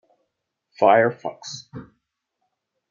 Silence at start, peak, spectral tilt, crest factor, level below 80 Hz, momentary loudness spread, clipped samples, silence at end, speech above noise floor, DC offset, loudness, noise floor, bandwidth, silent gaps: 0.8 s; -2 dBFS; -5 dB/octave; 22 dB; -68 dBFS; 24 LU; under 0.1%; 1.05 s; 58 dB; under 0.1%; -19 LUFS; -78 dBFS; 7.4 kHz; none